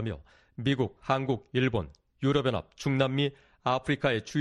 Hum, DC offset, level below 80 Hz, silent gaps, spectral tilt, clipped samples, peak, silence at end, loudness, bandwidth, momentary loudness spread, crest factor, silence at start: none; under 0.1%; -54 dBFS; none; -6.5 dB/octave; under 0.1%; -10 dBFS; 0 s; -29 LUFS; 10.5 kHz; 8 LU; 20 dB; 0 s